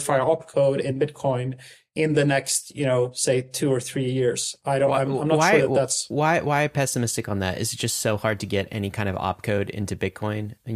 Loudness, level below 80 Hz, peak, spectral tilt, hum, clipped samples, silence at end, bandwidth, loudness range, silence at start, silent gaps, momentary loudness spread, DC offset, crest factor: -23 LUFS; -56 dBFS; -6 dBFS; -4.5 dB/octave; none; under 0.1%; 0 s; 15.5 kHz; 4 LU; 0 s; none; 8 LU; under 0.1%; 18 dB